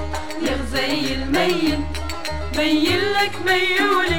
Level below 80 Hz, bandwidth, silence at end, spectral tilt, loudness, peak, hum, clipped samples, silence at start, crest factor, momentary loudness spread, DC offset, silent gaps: -34 dBFS; 19 kHz; 0 s; -4 dB/octave; -20 LUFS; -4 dBFS; none; under 0.1%; 0 s; 16 dB; 10 LU; 3%; none